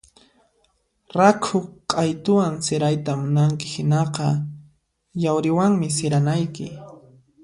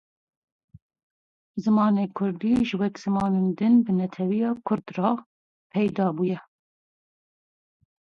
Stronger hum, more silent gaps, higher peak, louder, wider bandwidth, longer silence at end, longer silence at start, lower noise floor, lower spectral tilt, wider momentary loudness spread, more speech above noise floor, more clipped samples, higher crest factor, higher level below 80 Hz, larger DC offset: neither; second, none vs 5.26-5.70 s; first, -2 dBFS vs -8 dBFS; first, -21 LUFS vs -25 LUFS; first, 11.5 kHz vs 7 kHz; second, 0.45 s vs 1.8 s; second, 1.15 s vs 1.55 s; second, -66 dBFS vs under -90 dBFS; second, -6 dB/octave vs -8.5 dB/octave; first, 11 LU vs 8 LU; second, 46 dB vs over 67 dB; neither; about the same, 20 dB vs 18 dB; about the same, -60 dBFS vs -60 dBFS; neither